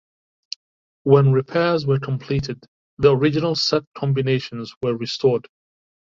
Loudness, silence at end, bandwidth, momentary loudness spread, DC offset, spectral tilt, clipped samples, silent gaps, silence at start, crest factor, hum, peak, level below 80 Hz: -20 LUFS; 0.75 s; 7.4 kHz; 16 LU; under 0.1%; -6.5 dB/octave; under 0.1%; 2.68-2.97 s, 3.87-3.92 s, 4.77-4.81 s; 1.05 s; 18 dB; none; -2 dBFS; -50 dBFS